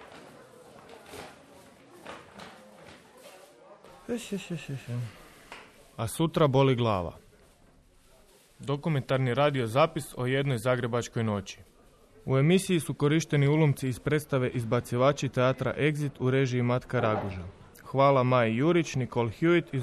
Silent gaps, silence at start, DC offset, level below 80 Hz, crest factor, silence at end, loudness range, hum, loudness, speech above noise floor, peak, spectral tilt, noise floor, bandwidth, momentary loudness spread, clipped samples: none; 0 s; under 0.1%; -58 dBFS; 18 dB; 0 s; 15 LU; none; -27 LUFS; 33 dB; -12 dBFS; -6.5 dB/octave; -59 dBFS; 13.5 kHz; 22 LU; under 0.1%